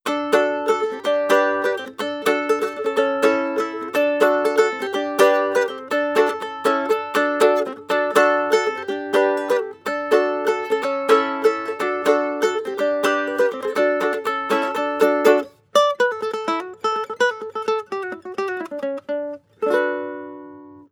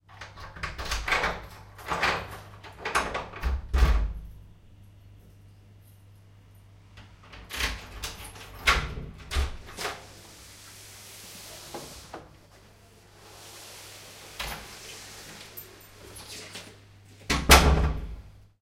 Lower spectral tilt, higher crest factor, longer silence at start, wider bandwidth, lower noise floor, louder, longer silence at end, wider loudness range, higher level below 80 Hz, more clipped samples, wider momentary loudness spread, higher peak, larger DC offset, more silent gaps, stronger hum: about the same, -3 dB/octave vs -3.5 dB/octave; second, 20 dB vs 30 dB; about the same, 0.05 s vs 0.1 s; first, 18 kHz vs 16 kHz; second, -41 dBFS vs -54 dBFS; first, -20 LUFS vs -27 LUFS; second, 0.1 s vs 0.3 s; second, 5 LU vs 18 LU; second, -76 dBFS vs -34 dBFS; neither; second, 10 LU vs 22 LU; about the same, 0 dBFS vs 0 dBFS; neither; neither; neither